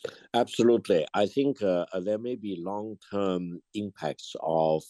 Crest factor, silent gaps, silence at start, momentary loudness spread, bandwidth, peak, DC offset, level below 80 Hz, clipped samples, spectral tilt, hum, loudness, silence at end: 18 dB; none; 0.05 s; 11 LU; 12.5 kHz; -10 dBFS; under 0.1%; -72 dBFS; under 0.1%; -6 dB/octave; none; -29 LUFS; 0.05 s